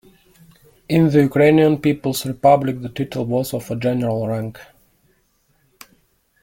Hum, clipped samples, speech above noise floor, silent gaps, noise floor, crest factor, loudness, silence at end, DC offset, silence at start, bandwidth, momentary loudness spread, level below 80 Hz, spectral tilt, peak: none; under 0.1%; 45 dB; none; -62 dBFS; 18 dB; -18 LUFS; 1.8 s; under 0.1%; 0.9 s; 17 kHz; 11 LU; -52 dBFS; -7 dB/octave; -2 dBFS